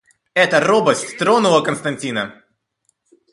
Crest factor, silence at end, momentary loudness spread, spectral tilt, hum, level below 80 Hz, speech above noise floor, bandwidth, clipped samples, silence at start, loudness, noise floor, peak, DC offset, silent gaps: 18 dB; 1 s; 10 LU; -4 dB/octave; none; -62 dBFS; 51 dB; 11.5 kHz; under 0.1%; 0.35 s; -16 LUFS; -67 dBFS; 0 dBFS; under 0.1%; none